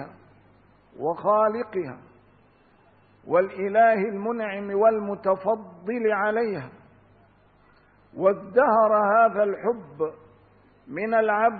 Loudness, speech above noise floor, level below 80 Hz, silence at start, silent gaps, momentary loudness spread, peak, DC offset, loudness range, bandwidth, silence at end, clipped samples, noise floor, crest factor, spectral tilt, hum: -23 LUFS; 36 dB; -68 dBFS; 0 s; none; 13 LU; -8 dBFS; under 0.1%; 5 LU; 4.7 kHz; 0 s; under 0.1%; -58 dBFS; 18 dB; -10.5 dB/octave; none